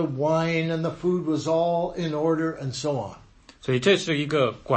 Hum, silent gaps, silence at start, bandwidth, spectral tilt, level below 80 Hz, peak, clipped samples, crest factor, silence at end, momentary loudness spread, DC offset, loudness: none; none; 0 s; 8.8 kHz; -6 dB/octave; -56 dBFS; -6 dBFS; under 0.1%; 18 dB; 0 s; 8 LU; under 0.1%; -25 LUFS